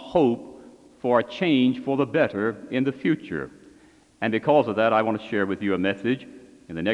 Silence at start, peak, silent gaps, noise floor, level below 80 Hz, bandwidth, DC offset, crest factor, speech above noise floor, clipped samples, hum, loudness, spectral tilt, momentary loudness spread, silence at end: 0 s; -6 dBFS; none; -54 dBFS; -62 dBFS; 9.6 kHz; under 0.1%; 18 dB; 31 dB; under 0.1%; none; -24 LUFS; -7.5 dB/octave; 11 LU; 0 s